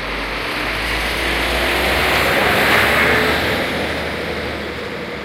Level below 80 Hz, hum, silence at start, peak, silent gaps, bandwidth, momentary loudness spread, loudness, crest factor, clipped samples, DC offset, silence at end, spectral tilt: -32 dBFS; none; 0 s; -4 dBFS; none; 16 kHz; 11 LU; -16 LUFS; 14 dB; under 0.1%; under 0.1%; 0 s; -3.5 dB/octave